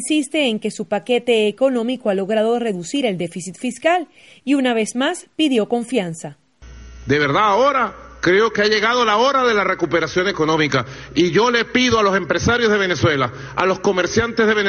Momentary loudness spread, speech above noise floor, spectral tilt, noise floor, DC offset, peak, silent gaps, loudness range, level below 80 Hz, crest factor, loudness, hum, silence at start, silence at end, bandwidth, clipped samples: 8 LU; 22 dB; -4.5 dB/octave; -40 dBFS; under 0.1%; -2 dBFS; none; 4 LU; -46 dBFS; 16 dB; -18 LUFS; none; 0 s; 0 s; 11.5 kHz; under 0.1%